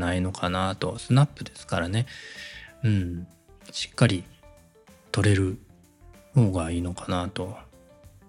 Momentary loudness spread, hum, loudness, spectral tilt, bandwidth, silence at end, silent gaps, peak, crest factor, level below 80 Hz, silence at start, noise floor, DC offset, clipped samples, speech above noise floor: 16 LU; none; -26 LUFS; -6 dB/octave; 11.5 kHz; 0.2 s; none; -4 dBFS; 22 dB; -54 dBFS; 0 s; -55 dBFS; under 0.1%; under 0.1%; 29 dB